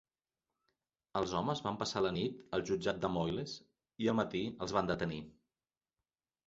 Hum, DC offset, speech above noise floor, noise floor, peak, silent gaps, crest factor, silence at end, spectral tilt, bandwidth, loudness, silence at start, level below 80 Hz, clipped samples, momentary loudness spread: none; under 0.1%; over 54 dB; under -90 dBFS; -16 dBFS; none; 22 dB; 1.15 s; -4.5 dB/octave; 7.6 kHz; -37 LUFS; 1.15 s; -62 dBFS; under 0.1%; 7 LU